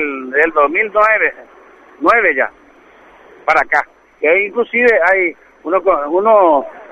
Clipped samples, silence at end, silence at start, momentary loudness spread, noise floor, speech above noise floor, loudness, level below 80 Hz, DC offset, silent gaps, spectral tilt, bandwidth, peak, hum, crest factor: under 0.1%; 0.1 s; 0 s; 8 LU; -44 dBFS; 31 dB; -13 LUFS; -52 dBFS; under 0.1%; none; -5 dB/octave; 8.8 kHz; 0 dBFS; none; 14 dB